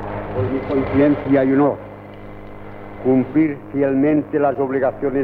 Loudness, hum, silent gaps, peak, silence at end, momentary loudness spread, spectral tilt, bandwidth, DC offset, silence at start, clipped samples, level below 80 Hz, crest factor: -18 LUFS; none; none; -6 dBFS; 0 s; 21 LU; -10.5 dB/octave; 4.5 kHz; under 0.1%; 0 s; under 0.1%; -42 dBFS; 14 dB